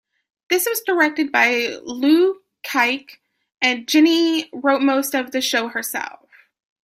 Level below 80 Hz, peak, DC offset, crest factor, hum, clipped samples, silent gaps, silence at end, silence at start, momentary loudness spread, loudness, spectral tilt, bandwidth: -70 dBFS; -2 dBFS; under 0.1%; 18 dB; none; under 0.1%; none; 0.75 s; 0.5 s; 9 LU; -19 LUFS; -1.5 dB/octave; 16 kHz